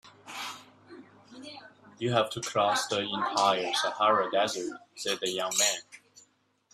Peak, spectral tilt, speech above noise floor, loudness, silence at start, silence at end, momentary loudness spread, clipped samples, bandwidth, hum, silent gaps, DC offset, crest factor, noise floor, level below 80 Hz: -10 dBFS; -2 dB/octave; 38 dB; -28 LUFS; 0.05 s; 0.75 s; 20 LU; under 0.1%; 15.5 kHz; none; none; under 0.1%; 20 dB; -67 dBFS; -74 dBFS